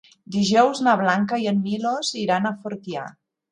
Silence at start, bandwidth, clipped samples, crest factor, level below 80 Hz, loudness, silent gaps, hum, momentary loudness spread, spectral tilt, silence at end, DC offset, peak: 0.3 s; 10.5 kHz; under 0.1%; 18 dB; -66 dBFS; -22 LUFS; none; none; 14 LU; -5 dB/octave; 0.4 s; under 0.1%; -4 dBFS